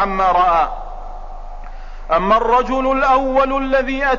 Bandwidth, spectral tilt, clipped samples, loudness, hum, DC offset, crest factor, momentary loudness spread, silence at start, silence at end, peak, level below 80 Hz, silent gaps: 7.2 kHz; -5.5 dB/octave; under 0.1%; -15 LUFS; none; 0.7%; 12 dB; 22 LU; 0 s; 0 s; -4 dBFS; -30 dBFS; none